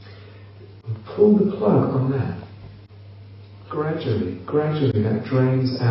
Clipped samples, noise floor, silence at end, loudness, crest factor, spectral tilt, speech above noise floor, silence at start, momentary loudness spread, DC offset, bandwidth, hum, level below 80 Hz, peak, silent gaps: under 0.1%; -42 dBFS; 0 s; -21 LUFS; 16 dB; -8 dB/octave; 23 dB; 0 s; 20 LU; under 0.1%; 5.8 kHz; none; -56 dBFS; -6 dBFS; none